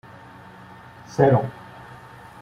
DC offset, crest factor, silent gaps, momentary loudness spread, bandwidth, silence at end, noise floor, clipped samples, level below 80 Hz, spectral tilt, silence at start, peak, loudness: under 0.1%; 24 dB; none; 26 LU; 10 kHz; 0.9 s; -44 dBFS; under 0.1%; -56 dBFS; -8.5 dB/octave; 1.1 s; -2 dBFS; -21 LUFS